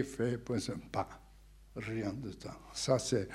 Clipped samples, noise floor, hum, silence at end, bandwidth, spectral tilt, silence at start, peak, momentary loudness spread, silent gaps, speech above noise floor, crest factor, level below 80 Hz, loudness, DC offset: under 0.1%; -58 dBFS; none; 0 s; 14.5 kHz; -5 dB/octave; 0 s; -14 dBFS; 14 LU; none; 22 dB; 22 dB; -58 dBFS; -37 LUFS; under 0.1%